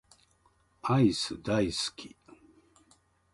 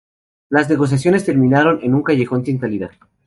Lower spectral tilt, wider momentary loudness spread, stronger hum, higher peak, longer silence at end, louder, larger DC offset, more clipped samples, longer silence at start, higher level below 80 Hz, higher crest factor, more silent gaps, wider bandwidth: second, -5.5 dB/octave vs -7.5 dB/octave; first, 18 LU vs 9 LU; neither; second, -14 dBFS vs -2 dBFS; first, 1.25 s vs 0.4 s; second, -29 LUFS vs -16 LUFS; neither; neither; first, 0.85 s vs 0.5 s; about the same, -58 dBFS vs -54 dBFS; first, 20 dB vs 14 dB; neither; about the same, 11.5 kHz vs 11.5 kHz